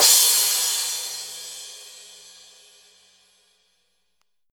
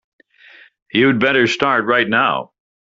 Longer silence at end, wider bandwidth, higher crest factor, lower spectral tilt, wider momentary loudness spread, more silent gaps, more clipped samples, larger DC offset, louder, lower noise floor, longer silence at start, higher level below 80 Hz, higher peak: first, 2.5 s vs 0.45 s; first, over 20 kHz vs 7.8 kHz; first, 24 dB vs 18 dB; second, 4 dB/octave vs -2.5 dB/octave; first, 27 LU vs 6 LU; neither; neither; neither; second, -18 LUFS vs -15 LUFS; first, -75 dBFS vs -46 dBFS; second, 0 s vs 0.95 s; second, -80 dBFS vs -58 dBFS; about the same, -2 dBFS vs 0 dBFS